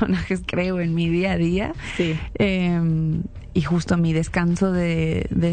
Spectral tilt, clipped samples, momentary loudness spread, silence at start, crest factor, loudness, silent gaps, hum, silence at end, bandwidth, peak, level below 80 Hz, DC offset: -7 dB/octave; under 0.1%; 5 LU; 0 s; 12 dB; -22 LUFS; none; none; 0 s; 9.2 kHz; -10 dBFS; -36 dBFS; under 0.1%